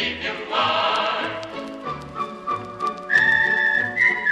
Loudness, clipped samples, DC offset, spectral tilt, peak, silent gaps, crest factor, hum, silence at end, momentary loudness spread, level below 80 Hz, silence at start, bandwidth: -20 LUFS; under 0.1%; under 0.1%; -3.5 dB/octave; -4 dBFS; none; 18 dB; none; 0 s; 15 LU; -54 dBFS; 0 s; 11.5 kHz